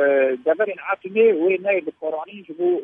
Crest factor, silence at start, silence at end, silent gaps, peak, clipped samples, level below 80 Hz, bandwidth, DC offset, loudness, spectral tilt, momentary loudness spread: 14 dB; 0 s; 0 s; none; -6 dBFS; under 0.1%; -78 dBFS; 3.7 kHz; under 0.1%; -21 LUFS; -8.5 dB/octave; 11 LU